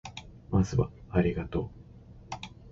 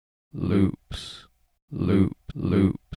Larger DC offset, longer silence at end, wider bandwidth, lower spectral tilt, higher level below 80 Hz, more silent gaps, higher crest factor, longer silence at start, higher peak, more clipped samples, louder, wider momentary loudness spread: neither; about the same, 0 s vs 0.05 s; second, 7.8 kHz vs 11 kHz; about the same, -7.5 dB/octave vs -8 dB/octave; about the same, -44 dBFS vs -46 dBFS; second, none vs 1.62-1.68 s; about the same, 20 dB vs 18 dB; second, 0.05 s vs 0.35 s; second, -12 dBFS vs -8 dBFS; neither; second, -30 LUFS vs -25 LUFS; about the same, 16 LU vs 17 LU